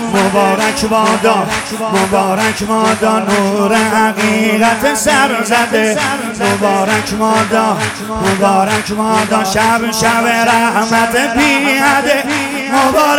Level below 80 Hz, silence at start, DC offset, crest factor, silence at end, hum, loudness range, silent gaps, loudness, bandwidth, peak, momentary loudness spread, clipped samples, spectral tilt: -42 dBFS; 0 s; under 0.1%; 12 dB; 0 s; none; 2 LU; none; -12 LUFS; 17 kHz; 0 dBFS; 4 LU; under 0.1%; -3.5 dB/octave